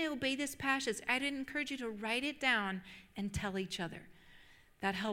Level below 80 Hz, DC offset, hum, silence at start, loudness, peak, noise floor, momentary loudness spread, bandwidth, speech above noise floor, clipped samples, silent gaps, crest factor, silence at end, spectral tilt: -62 dBFS; under 0.1%; none; 0 s; -37 LUFS; -18 dBFS; -61 dBFS; 11 LU; 16.5 kHz; 24 dB; under 0.1%; none; 22 dB; 0 s; -3.5 dB/octave